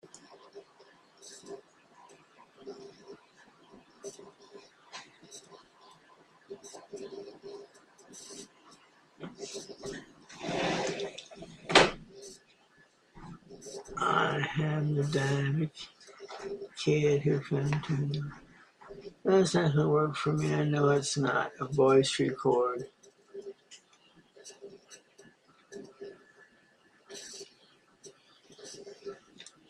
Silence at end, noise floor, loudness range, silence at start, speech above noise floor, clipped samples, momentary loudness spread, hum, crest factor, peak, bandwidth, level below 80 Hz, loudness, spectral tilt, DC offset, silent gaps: 0.25 s; -65 dBFS; 23 LU; 0.05 s; 37 dB; under 0.1%; 25 LU; none; 28 dB; -6 dBFS; 11 kHz; -64 dBFS; -29 LUFS; -5 dB/octave; under 0.1%; none